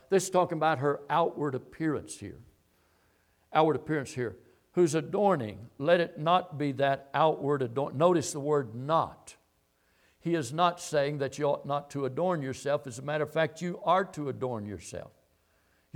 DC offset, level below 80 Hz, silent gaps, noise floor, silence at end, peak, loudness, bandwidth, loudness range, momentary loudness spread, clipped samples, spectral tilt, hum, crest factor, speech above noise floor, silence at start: under 0.1%; -68 dBFS; none; -71 dBFS; 0.9 s; -10 dBFS; -30 LUFS; 17 kHz; 4 LU; 10 LU; under 0.1%; -5.5 dB/octave; none; 20 dB; 42 dB; 0.1 s